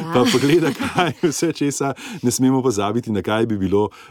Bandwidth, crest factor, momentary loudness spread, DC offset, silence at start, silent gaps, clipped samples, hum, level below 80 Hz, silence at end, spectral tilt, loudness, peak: 17.5 kHz; 14 dB; 6 LU; under 0.1%; 0 s; none; under 0.1%; none; -56 dBFS; 0.05 s; -5 dB/octave; -19 LUFS; -4 dBFS